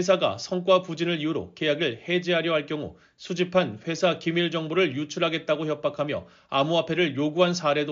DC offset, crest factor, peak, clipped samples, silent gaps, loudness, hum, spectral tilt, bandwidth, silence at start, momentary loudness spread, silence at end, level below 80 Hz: under 0.1%; 18 dB; -8 dBFS; under 0.1%; none; -25 LUFS; none; -3.5 dB/octave; 7.6 kHz; 0 s; 7 LU; 0 s; -66 dBFS